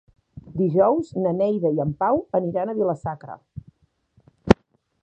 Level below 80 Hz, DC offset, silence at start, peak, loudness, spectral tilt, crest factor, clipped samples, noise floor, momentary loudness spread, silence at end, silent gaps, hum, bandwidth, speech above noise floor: -44 dBFS; under 0.1%; 0.35 s; 0 dBFS; -22 LUFS; -8.5 dB/octave; 24 dB; under 0.1%; -62 dBFS; 20 LU; 0.5 s; none; none; 8.6 kHz; 40 dB